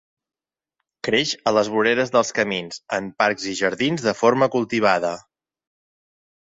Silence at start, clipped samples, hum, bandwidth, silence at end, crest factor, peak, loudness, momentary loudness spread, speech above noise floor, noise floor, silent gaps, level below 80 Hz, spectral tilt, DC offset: 1.05 s; under 0.1%; none; 8 kHz; 1.3 s; 20 dB; -2 dBFS; -21 LUFS; 9 LU; 60 dB; -80 dBFS; none; -62 dBFS; -4 dB/octave; under 0.1%